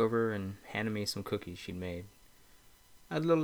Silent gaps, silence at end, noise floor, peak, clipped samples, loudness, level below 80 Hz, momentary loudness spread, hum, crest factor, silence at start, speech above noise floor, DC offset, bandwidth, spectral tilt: none; 0 s; -61 dBFS; -16 dBFS; under 0.1%; -36 LUFS; -64 dBFS; 12 LU; none; 18 dB; 0 s; 27 dB; under 0.1%; over 20 kHz; -6 dB/octave